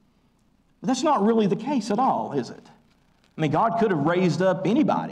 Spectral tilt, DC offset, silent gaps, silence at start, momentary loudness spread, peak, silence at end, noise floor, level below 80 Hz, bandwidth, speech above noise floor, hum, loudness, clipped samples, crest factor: -6.5 dB/octave; under 0.1%; none; 0.8 s; 8 LU; -12 dBFS; 0 s; -63 dBFS; -64 dBFS; 10.5 kHz; 41 dB; none; -23 LUFS; under 0.1%; 12 dB